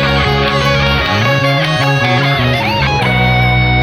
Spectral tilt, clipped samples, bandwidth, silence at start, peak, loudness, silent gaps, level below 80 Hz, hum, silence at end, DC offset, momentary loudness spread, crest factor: -5.5 dB/octave; under 0.1%; 15 kHz; 0 s; 0 dBFS; -11 LUFS; none; -24 dBFS; none; 0 s; under 0.1%; 2 LU; 12 dB